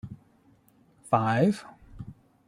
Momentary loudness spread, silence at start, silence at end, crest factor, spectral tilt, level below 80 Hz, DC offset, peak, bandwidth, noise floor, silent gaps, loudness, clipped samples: 22 LU; 0.05 s; 0.35 s; 22 dB; -7.5 dB/octave; -58 dBFS; under 0.1%; -8 dBFS; 12 kHz; -62 dBFS; none; -26 LUFS; under 0.1%